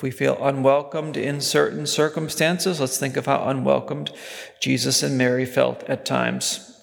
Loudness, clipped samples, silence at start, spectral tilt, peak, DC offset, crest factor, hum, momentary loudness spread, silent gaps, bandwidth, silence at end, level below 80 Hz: -22 LUFS; under 0.1%; 0 s; -4 dB/octave; -4 dBFS; under 0.1%; 18 dB; none; 8 LU; none; 19.5 kHz; 0.1 s; -66 dBFS